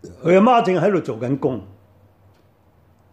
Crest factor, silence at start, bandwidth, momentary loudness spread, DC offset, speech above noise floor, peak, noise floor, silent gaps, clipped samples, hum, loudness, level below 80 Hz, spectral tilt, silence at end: 16 dB; 0.05 s; 8.8 kHz; 11 LU; under 0.1%; 39 dB; -4 dBFS; -56 dBFS; none; under 0.1%; none; -18 LUFS; -62 dBFS; -7.5 dB/octave; 1.45 s